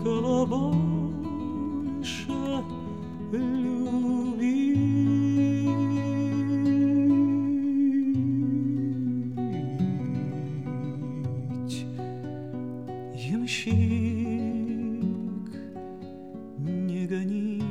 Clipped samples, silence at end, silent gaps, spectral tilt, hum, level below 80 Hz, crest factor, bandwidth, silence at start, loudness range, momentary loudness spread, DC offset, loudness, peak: under 0.1%; 0 s; none; -7.5 dB/octave; none; -56 dBFS; 14 dB; 9.6 kHz; 0 s; 8 LU; 12 LU; 0.3%; -27 LUFS; -12 dBFS